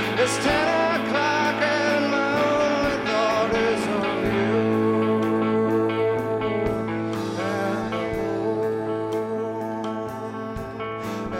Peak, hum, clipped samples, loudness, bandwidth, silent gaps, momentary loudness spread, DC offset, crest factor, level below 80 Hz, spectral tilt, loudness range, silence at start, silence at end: -8 dBFS; none; under 0.1%; -23 LUFS; 16 kHz; none; 9 LU; under 0.1%; 16 dB; -48 dBFS; -5 dB/octave; 5 LU; 0 s; 0 s